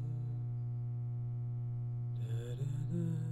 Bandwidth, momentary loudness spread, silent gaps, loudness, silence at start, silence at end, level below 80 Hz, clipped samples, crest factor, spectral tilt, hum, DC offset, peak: 8 kHz; 3 LU; none; -39 LUFS; 0 s; 0 s; -60 dBFS; under 0.1%; 10 dB; -9 dB/octave; 60 Hz at -40 dBFS; under 0.1%; -28 dBFS